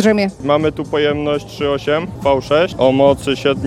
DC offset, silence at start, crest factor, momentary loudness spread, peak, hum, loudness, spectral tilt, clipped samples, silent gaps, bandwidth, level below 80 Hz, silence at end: under 0.1%; 0 s; 16 dB; 6 LU; 0 dBFS; none; -16 LUFS; -6 dB/octave; under 0.1%; none; 13.5 kHz; -40 dBFS; 0 s